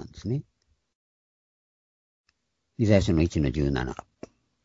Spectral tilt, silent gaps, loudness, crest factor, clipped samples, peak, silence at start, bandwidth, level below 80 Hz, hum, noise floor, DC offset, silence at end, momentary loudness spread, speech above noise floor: -7 dB/octave; 0.95-2.24 s; -26 LUFS; 24 dB; under 0.1%; -4 dBFS; 0 s; 7.8 kHz; -42 dBFS; none; -74 dBFS; under 0.1%; 0.65 s; 12 LU; 49 dB